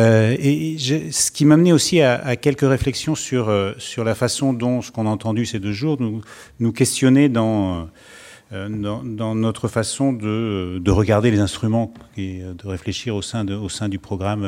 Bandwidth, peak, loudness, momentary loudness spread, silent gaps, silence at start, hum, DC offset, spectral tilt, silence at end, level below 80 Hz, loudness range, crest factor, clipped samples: 16.5 kHz; -2 dBFS; -19 LUFS; 13 LU; none; 0 s; none; under 0.1%; -5.5 dB/octave; 0 s; -44 dBFS; 5 LU; 16 dB; under 0.1%